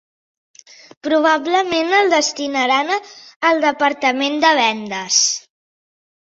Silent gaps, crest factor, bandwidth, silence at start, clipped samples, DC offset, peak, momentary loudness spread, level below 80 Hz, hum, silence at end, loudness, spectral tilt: 3.36-3.40 s; 16 dB; 8 kHz; 1.05 s; under 0.1%; under 0.1%; -2 dBFS; 7 LU; -66 dBFS; none; 0.9 s; -16 LUFS; -1 dB/octave